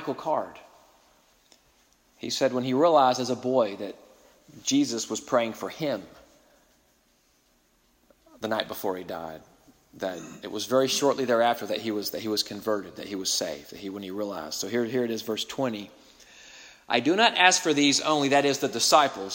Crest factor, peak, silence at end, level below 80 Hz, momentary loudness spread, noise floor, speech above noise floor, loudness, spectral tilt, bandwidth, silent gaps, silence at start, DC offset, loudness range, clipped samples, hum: 26 dB; -2 dBFS; 0 s; -70 dBFS; 17 LU; -66 dBFS; 40 dB; -25 LUFS; -3 dB/octave; 16.5 kHz; none; 0 s; under 0.1%; 12 LU; under 0.1%; none